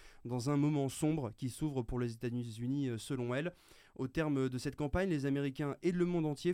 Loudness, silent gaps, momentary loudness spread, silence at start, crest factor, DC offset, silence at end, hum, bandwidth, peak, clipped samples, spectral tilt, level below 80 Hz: -37 LUFS; none; 7 LU; 0 s; 16 dB; under 0.1%; 0 s; none; 15.5 kHz; -20 dBFS; under 0.1%; -6.5 dB/octave; -54 dBFS